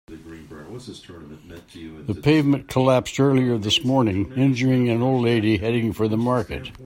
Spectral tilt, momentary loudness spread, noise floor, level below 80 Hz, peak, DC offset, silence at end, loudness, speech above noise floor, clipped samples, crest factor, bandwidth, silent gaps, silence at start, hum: -6.5 dB/octave; 21 LU; -40 dBFS; -50 dBFS; -4 dBFS; under 0.1%; 0 s; -20 LUFS; 19 dB; under 0.1%; 18 dB; 16 kHz; none; 0.1 s; none